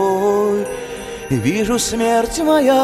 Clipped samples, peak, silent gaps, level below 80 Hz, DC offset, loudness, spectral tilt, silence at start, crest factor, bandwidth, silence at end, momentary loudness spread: under 0.1%; -4 dBFS; none; -40 dBFS; under 0.1%; -17 LUFS; -4.5 dB/octave; 0 s; 14 dB; 16.5 kHz; 0 s; 12 LU